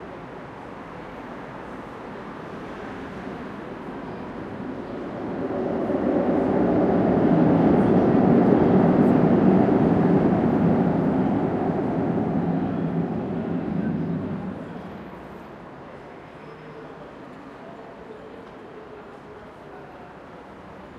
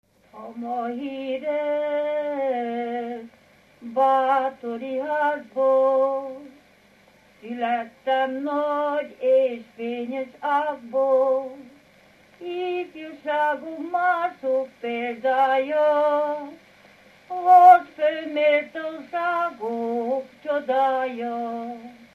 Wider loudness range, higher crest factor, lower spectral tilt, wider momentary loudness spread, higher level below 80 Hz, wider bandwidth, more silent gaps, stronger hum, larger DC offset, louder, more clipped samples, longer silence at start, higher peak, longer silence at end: first, 22 LU vs 8 LU; about the same, 20 dB vs 20 dB; first, -10 dB/octave vs -5 dB/octave; first, 23 LU vs 13 LU; first, -48 dBFS vs -74 dBFS; second, 6.6 kHz vs 12 kHz; neither; neither; neither; about the same, -21 LUFS vs -23 LUFS; neither; second, 0 s vs 0.35 s; about the same, -4 dBFS vs -2 dBFS; second, 0 s vs 0.2 s